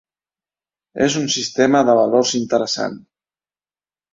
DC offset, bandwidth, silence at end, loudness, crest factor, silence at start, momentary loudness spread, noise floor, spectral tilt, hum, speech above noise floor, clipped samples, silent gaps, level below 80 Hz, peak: under 0.1%; 7.8 kHz; 1.15 s; -17 LUFS; 18 dB; 0.95 s; 9 LU; under -90 dBFS; -3.5 dB/octave; none; over 73 dB; under 0.1%; none; -62 dBFS; -2 dBFS